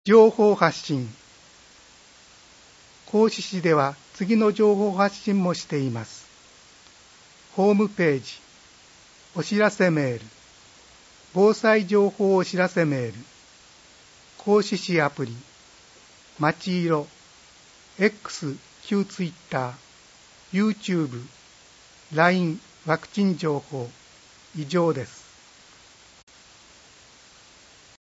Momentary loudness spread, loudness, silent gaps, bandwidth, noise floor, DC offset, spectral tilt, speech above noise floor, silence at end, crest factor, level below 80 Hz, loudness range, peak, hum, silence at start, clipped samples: 16 LU; -23 LUFS; none; 8 kHz; -52 dBFS; under 0.1%; -6 dB/octave; 30 dB; 2.9 s; 24 dB; -68 dBFS; 7 LU; -2 dBFS; none; 0.05 s; under 0.1%